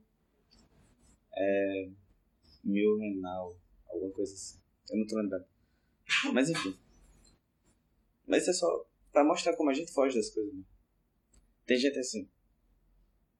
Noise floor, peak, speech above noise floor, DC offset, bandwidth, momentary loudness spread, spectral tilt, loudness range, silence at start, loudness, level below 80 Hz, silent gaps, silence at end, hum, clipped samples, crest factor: -74 dBFS; -14 dBFS; 43 dB; under 0.1%; 12.5 kHz; 15 LU; -4 dB/octave; 5 LU; 1.35 s; -32 LUFS; -70 dBFS; none; 1.15 s; none; under 0.1%; 20 dB